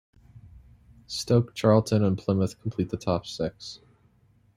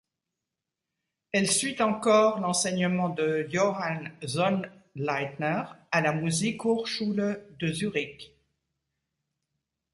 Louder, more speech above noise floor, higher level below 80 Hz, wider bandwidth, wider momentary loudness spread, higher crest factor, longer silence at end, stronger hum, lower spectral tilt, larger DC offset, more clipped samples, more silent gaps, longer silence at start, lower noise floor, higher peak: about the same, -26 LUFS vs -27 LUFS; second, 37 dB vs 60 dB; first, -56 dBFS vs -68 dBFS; first, 14 kHz vs 11.5 kHz; first, 14 LU vs 9 LU; about the same, 22 dB vs 20 dB; second, 0.8 s vs 1.65 s; neither; first, -6.5 dB/octave vs -4 dB/octave; neither; neither; neither; second, 0.45 s vs 1.35 s; second, -62 dBFS vs -87 dBFS; first, -6 dBFS vs -10 dBFS